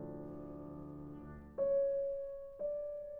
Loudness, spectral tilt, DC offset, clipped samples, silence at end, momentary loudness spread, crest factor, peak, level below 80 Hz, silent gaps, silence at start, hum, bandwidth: -40 LUFS; -10.5 dB/octave; under 0.1%; under 0.1%; 0 s; 15 LU; 12 dB; -28 dBFS; -62 dBFS; none; 0 s; none; 2.4 kHz